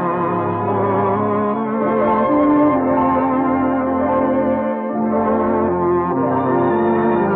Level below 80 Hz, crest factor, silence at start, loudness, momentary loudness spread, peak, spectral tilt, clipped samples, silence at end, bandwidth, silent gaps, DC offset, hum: -48 dBFS; 10 dB; 0 s; -17 LUFS; 4 LU; -6 dBFS; -12 dB/octave; under 0.1%; 0 s; 4 kHz; none; under 0.1%; none